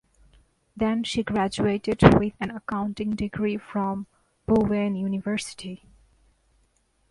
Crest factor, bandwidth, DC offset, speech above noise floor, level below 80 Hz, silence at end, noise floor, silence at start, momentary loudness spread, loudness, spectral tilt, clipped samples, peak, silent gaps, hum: 26 dB; 11.5 kHz; under 0.1%; 43 dB; -44 dBFS; 1.35 s; -67 dBFS; 0.75 s; 17 LU; -25 LUFS; -6.5 dB/octave; under 0.1%; 0 dBFS; none; none